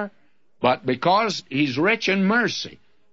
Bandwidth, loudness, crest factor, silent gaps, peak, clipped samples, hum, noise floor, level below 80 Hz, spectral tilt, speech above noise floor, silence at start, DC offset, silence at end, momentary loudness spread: 7.8 kHz; -21 LUFS; 18 dB; none; -4 dBFS; under 0.1%; none; -65 dBFS; -66 dBFS; -5 dB/octave; 44 dB; 0 s; 0.2%; 0.4 s; 9 LU